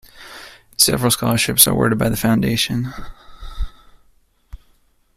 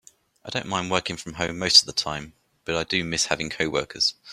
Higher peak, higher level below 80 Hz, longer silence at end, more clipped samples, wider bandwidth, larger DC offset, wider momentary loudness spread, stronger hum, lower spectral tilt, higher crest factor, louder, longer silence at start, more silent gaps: about the same, 0 dBFS vs -2 dBFS; first, -36 dBFS vs -54 dBFS; first, 0.6 s vs 0 s; neither; about the same, 16 kHz vs 15.5 kHz; neither; first, 24 LU vs 16 LU; neither; first, -3.5 dB/octave vs -2 dB/octave; about the same, 20 dB vs 24 dB; first, -16 LUFS vs -23 LUFS; second, 0.15 s vs 0.45 s; neither